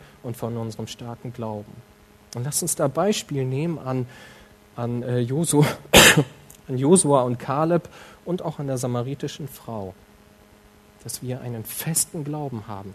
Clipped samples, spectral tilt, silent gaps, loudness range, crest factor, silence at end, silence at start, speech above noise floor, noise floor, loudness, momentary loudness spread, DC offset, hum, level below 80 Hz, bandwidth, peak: under 0.1%; -3.5 dB/octave; none; 13 LU; 24 dB; 0 s; 0 s; 28 dB; -52 dBFS; -22 LUFS; 18 LU; under 0.1%; none; -48 dBFS; 13.5 kHz; 0 dBFS